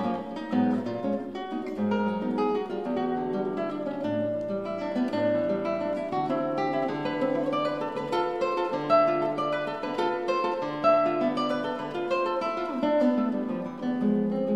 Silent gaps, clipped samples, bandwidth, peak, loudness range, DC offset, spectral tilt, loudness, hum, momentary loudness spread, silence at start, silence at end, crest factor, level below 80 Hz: none; under 0.1%; 9.6 kHz; -10 dBFS; 3 LU; 0.1%; -7 dB/octave; -28 LUFS; none; 7 LU; 0 s; 0 s; 16 dB; -66 dBFS